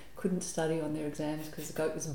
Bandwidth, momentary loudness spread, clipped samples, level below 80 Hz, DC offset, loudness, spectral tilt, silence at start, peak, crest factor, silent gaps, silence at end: 19 kHz; 5 LU; under 0.1%; -60 dBFS; 0.4%; -35 LUFS; -5 dB/octave; 0 s; -18 dBFS; 16 dB; none; 0 s